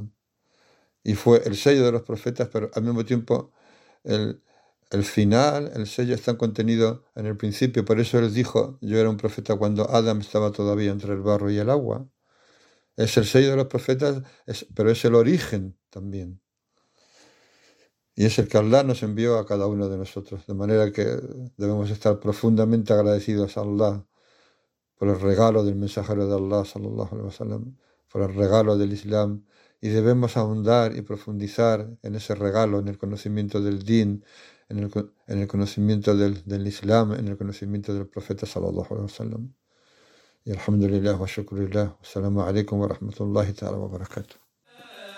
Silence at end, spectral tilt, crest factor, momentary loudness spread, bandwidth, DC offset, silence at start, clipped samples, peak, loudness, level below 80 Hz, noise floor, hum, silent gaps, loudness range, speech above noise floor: 0 s; -7 dB/octave; 20 dB; 14 LU; 15.5 kHz; under 0.1%; 0 s; under 0.1%; -4 dBFS; -24 LUFS; -58 dBFS; -73 dBFS; none; none; 5 LU; 50 dB